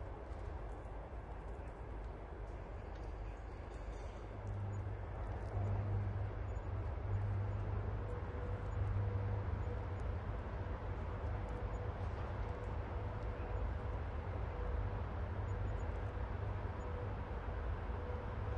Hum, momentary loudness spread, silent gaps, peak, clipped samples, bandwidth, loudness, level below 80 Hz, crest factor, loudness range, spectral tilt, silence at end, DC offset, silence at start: none; 9 LU; none; -28 dBFS; under 0.1%; 7.4 kHz; -44 LUFS; -46 dBFS; 14 dB; 7 LU; -8.5 dB/octave; 0 s; under 0.1%; 0 s